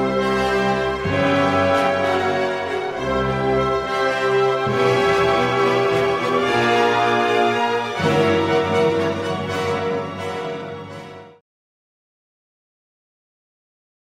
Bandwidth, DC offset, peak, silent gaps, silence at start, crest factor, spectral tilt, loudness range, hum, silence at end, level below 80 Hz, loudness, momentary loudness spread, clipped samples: 14 kHz; under 0.1%; -6 dBFS; none; 0 s; 14 dB; -5.5 dB/octave; 10 LU; none; 2.75 s; -46 dBFS; -19 LUFS; 9 LU; under 0.1%